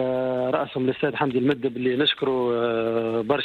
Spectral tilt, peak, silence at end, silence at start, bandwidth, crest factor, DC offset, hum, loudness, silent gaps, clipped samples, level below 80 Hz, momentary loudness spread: -7.5 dB/octave; -10 dBFS; 0 s; 0 s; 4.7 kHz; 14 dB; under 0.1%; none; -24 LUFS; none; under 0.1%; -62 dBFS; 3 LU